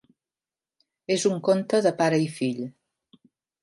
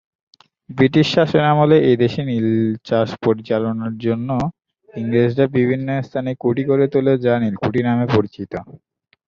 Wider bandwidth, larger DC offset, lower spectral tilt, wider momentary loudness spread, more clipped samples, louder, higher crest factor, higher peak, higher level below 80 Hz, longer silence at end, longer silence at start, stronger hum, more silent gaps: first, 11.5 kHz vs 7.4 kHz; neither; second, -5 dB/octave vs -8 dB/octave; first, 14 LU vs 10 LU; neither; second, -24 LUFS vs -18 LUFS; about the same, 18 dB vs 16 dB; second, -8 dBFS vs -2 dBFS; second, -76 dBFS vs -50 dBFS; first, 0.9 s vs 0.5 s; first, 1.1 s vs 0.7 s; neither; neither